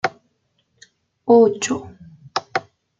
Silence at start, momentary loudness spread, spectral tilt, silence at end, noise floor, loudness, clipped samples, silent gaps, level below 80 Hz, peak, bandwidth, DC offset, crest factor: 0.05 s; 14 LU; -4 dB/octave; 0.4 s; -68 dBFS; -19 LUFS; under 0.1%; none; -66 dBFS; -2 dBFS; 9.2 kHz; under 0.1%; 18 dB